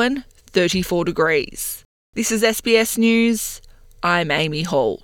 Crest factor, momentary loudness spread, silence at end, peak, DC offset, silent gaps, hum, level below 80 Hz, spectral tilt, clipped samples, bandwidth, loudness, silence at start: 18 dB; 12 LU; 0.05 s; -2 dBFS; under 0.1%; 1.85-2.13 s; none; -46 dBFS; -4 dB/octave; under 0.1%; 18 kHz; -19 LUFS; 0 s